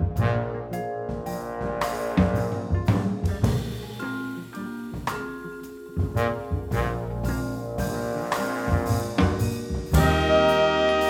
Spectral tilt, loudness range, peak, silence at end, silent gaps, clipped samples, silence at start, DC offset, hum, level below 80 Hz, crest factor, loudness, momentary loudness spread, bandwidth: -6.5 dB/octave; 6 LU; -6 dBFS; 0 s; none; under 0.1%; 0 s; under 0.1%; none; -34 dBFS; 20 dB; -26 LUFS; 13 LU; 18 kHz